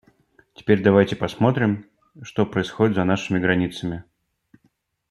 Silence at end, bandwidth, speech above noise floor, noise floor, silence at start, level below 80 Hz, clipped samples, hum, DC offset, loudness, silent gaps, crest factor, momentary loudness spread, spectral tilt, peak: 1.1 s; 12 kHz; 46 dB; -67 dBFS; 0.6 s; -56 dBFS; under 0.1%; none; under 0.1%; -21 LUFS; none; 20 dB; 14 LU; -7 dB/octave; -2 dBFS